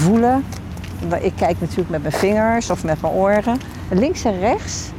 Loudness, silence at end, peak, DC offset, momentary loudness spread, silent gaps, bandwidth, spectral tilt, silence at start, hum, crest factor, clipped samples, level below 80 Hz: -19 LUFS; 0 s; -6 dBFS; under 0.1%; 8 LU; none; 16 kHz; -6 dB/octave; 0 s; none; 12 dB; under 0.1%; -36 dBFS